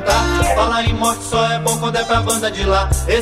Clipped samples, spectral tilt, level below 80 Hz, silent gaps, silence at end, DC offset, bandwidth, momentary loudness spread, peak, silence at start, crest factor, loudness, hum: under 0.1%; -4 dB/octave; -24 dBFS; none; 0 s; under 0.1%; 16 kHz; 3 LU; -2 dBFS; 0 s; 14 dB; -16 LUFS; none